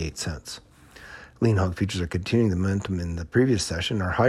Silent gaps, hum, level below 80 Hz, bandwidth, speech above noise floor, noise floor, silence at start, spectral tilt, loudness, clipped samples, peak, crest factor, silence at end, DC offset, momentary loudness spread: none; none; -44 dBFS; 12.5 kHz; 22 dB; -46 dBFS; 0 s; -6 dB/octave; -25 LUFS; under 0.1%; -8 dBFS; 18 dB; 0 s; under 0.1%; 17 LU